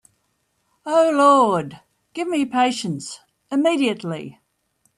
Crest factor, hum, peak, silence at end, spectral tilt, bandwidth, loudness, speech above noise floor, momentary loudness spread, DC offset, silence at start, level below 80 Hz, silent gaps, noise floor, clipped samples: 18 dB; none; -4 dBFS; 0.65 s; -5 dB/octave; 12.5 kHz; -19 LUFS; 51 dB; 22 LU; under 0.1%; 0.85 s; -70 dBFS; none; -69 dBFS; under 0.1%